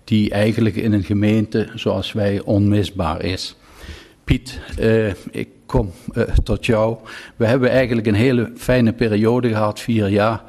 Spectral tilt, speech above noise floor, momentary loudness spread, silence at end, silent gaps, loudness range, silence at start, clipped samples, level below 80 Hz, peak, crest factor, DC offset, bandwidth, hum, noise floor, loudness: -7 dB/octave; 20 dB; 12 LU; 0.05 s; none; 5 LU; 0.05 s; under 0.1%; -32 dBFS; -4 dBFS; 14 dB; under 0.1%; 13.5 kHz; none; -38 dBFS; -18 LUFS